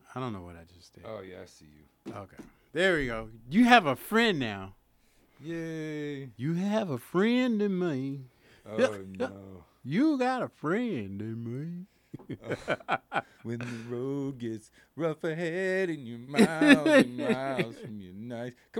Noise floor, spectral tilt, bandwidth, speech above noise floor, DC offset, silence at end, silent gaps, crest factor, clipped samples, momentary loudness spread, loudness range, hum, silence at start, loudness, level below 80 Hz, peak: -65 dBFS; -5.5 dB/octave; 17 kHz; 36 dB; under 0.1%; 0 s; none; 26 dB; under 0.1%; 21 LU; 9 LU; none; 0.1 s; -29 LUFS; -60 dBFS; -4 dBFS